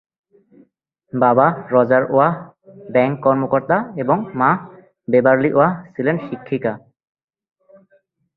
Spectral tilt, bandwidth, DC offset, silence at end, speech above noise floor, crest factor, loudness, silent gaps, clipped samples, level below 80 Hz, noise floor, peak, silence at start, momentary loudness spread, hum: -11.5 dB/octave; 4.2 kHz; under 0.1%; 1.6 s; 44 dB; 18 dB; -17 LUFS; none; under 0.1%; -60 dBFS; -61 dBFS; -2 dBFS; 1.15 s; 11 LU; none